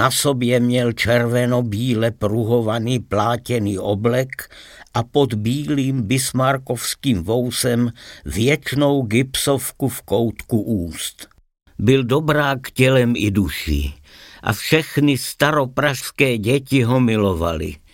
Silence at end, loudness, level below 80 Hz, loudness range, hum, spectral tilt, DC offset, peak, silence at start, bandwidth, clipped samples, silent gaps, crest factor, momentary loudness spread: 0.15 s; -19 LUFS; -38 dBFS; 2 LU; none; -5 dB/octave; under 0.1%; -2 dBFS; 0 s; 17 kHz; under 0.1%; none; 18 dB; 8 LU